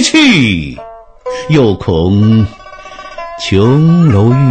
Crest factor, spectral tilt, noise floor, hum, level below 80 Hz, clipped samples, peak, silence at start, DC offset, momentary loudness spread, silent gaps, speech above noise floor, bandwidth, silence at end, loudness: 10 dB; -6 dB/octave; -31 dBFS; none; -34 dBFS; under 0.1%; 0 dBFS; 0 s; under 0.1%; 20 LU; none; 23 dB; 9 kHz; 0 s; -9 LUFS